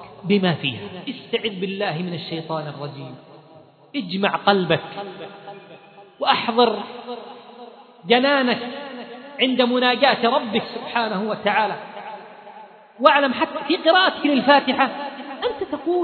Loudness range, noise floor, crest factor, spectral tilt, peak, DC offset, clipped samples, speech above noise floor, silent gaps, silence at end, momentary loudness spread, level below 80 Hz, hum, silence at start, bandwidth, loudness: 6 LU; -48 dBFS; 22 dB; -8 dB/octave; 0 dBFS; under 0.1%; under 0.1%; 28 dB; none; 0 s; 20 LU; -68 dBFS; none; 0 s; 5.4 kHz; -20 LUFS